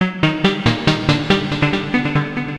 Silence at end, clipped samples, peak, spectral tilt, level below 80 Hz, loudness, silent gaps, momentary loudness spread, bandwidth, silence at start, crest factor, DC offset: 0 s; under 0.1%; 0 dBFS; -6 dB/octave; -38 dBFS; -17 LUFS; none; 2 LU; 10.5 kHz; 0 s; 18 dB; 0.4%